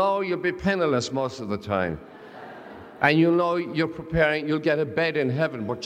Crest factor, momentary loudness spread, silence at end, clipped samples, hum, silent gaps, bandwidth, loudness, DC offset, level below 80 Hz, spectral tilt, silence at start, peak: 20 dB; 21 LU; 0 s; under 0.1%; none; none; 9.6 kHz; -24 LUFS; under 0.1%; -52 dBFS; -6 dB/octave; 0 s; -6 dBFS